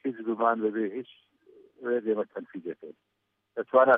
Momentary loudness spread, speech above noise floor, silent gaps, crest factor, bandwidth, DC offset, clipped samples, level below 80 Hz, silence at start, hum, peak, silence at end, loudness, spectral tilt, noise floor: 16 LU; 30 dB; none; 20 dB; 3.7 kHz; under 0.1%; under 0.1%; -90 dBFS; 0.05 s; none; -8 dBFS; 0 s; -30 LUFS; -8.5 dB/octave; -57 dBFS